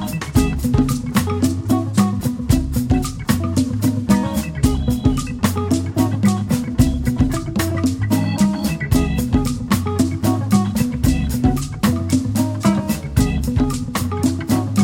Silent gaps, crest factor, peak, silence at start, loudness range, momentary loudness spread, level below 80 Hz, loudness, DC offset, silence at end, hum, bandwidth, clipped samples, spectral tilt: none; 16 dB; -2 dBFS; 0 s; 1 LU; 3 LU; -28 dBFS; -19 LUFS; under 0.1%; 0 s; none; 17 kHz; under 0.1%; -6 dB/octave